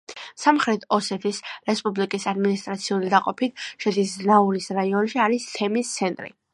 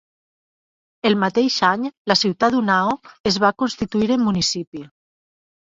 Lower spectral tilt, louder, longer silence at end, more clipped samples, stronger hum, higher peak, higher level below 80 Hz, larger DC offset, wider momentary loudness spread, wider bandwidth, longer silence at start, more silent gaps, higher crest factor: about the same, -4.5 dB/octave vs -4 dB/octave; second, -23 LUFS vs -19 LUFS; second, 0.25 s vs 0.85 s; neither; neither; about the same, -2 dBFS vs -2 dBFS; second, -72 dBFS vs -54 dBFS; neither; about the same, 8 LU vs 7 LU; first, 11.5 kHz vs 7.8 kHz; second, 0.1 s vs 1.05 s; second, none vs 1.97-2.05 s, 3.20-3.24 s, 4.67-4.72 s; about the same, 20 dB vs 20 dB